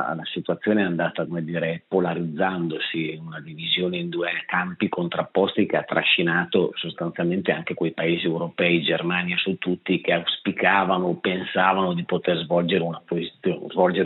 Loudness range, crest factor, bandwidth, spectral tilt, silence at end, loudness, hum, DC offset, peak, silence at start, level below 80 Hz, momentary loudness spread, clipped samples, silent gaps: 3 LU; 20 dB; 4.1 kHz; -3.5 dB/octave; 0 s; -23 LUFS; none; under 0.1%; -2 dBFS; 0 s; -74 dBFS; 8 LU; under 0.1%; none